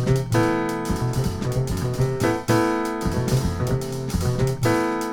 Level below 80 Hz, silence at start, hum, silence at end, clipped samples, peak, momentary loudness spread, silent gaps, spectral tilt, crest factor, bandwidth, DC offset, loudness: -36 dBFS; 0 s; none; 0 s; under 0.1%; -6 dBFS; 5 LU; none; -6.5 dB/octave; 16 dB; 19 kHz; under 0.1%; -23 LUFS